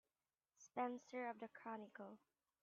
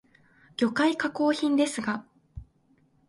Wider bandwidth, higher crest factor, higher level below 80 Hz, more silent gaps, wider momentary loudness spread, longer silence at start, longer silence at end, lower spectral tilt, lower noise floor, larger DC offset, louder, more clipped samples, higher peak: second, 7.2 kHz vs 11.5 kHz; about the same, 20 dB vs 18 dB; second, under -90 dBFS vs -58 dBFS; neither; second, 15 LU vs 24 LU; about the same, 0.6 s vs 0.6 s; second, 0.45 s vs 0.65 s; about the same, -4 dB/octave vs -4 dB/octave; first, under -90 dBFS vs -65 dBFS; neither; second, -51 LUFS vs -26 LUFS; neither; second, -32 dBFS vs -12 dBFS